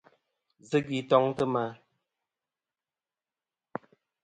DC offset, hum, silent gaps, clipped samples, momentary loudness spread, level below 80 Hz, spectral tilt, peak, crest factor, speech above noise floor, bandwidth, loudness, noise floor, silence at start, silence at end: under 0.1%; none; none; under 0.1%; 18 LU; -72 dBFS; -6.5 dB/octave; -10 dBFS; 24 dB; over 63 dB; 10 kHz; -28 LUFS; under -90 dBFS; 0.7 s; 2.5 s